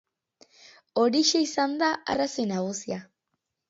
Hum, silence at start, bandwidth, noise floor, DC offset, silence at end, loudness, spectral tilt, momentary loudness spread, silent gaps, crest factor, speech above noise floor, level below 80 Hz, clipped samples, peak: none; 0.95 s; 8 kHz; -81 dBFS; under 0.1%; 0.65 s; -26 LUFS; -3.5 dB/octave; 12 LU; none; 18 dB; 55 dB; -68 dBFS; under 0.1%; -10 dBFS